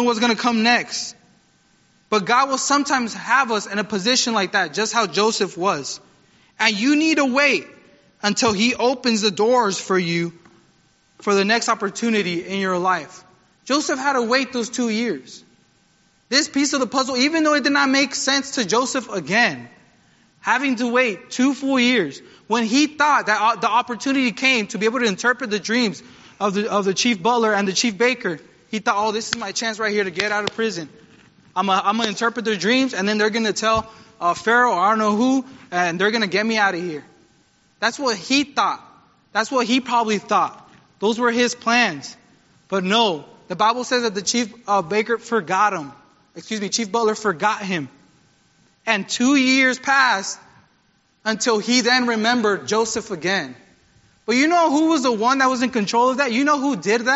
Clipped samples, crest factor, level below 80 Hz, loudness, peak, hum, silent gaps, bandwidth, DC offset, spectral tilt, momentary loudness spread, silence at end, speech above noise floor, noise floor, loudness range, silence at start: under 0.1%; 20 dB; -62 dBFS; -19 LUFS; 0 dBFS; none; none; 8 kHz; under 0.1%; -2 dB/octave; 8 LU; 0 s; 42 dB; -62 dBFS; 3 LU; 0 s